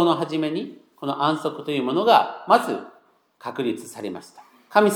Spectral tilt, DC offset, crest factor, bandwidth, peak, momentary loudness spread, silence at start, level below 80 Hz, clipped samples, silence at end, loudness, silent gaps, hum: -5 dB/octave; under 0.1%; 20 dB; 19 kHz; -2 dBFS; 16 LU; 0 s; -82 dBFS; under 0.1%; 0 s; -23 LUFS; none; none